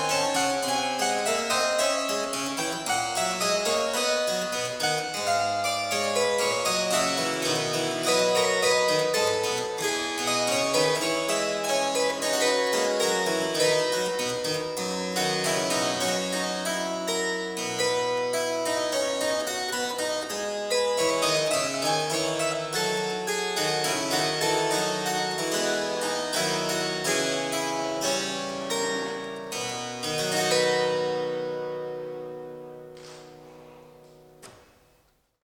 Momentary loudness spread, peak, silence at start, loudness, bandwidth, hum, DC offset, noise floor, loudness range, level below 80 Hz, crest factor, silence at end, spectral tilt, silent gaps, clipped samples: 7 LU; -10 dBFS; 0 s; -25 LUFS; 19.5 kHz; none; under 0.1%; -65 dBFS; 4 LU; -64 dBFS; 16 dB; 0.9 s; -2 dB/octave; none; under 0.1%